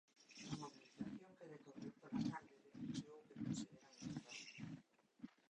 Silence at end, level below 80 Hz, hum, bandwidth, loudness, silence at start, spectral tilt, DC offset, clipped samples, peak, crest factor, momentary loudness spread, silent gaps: 0.15 s; -80 dBFS; none; 10 kHz; -52 LUFS; 0.15 s; -5 dB/octave; under 0.1%; under 0.1%; -32 dBFS; 20 dB; 14 LU; none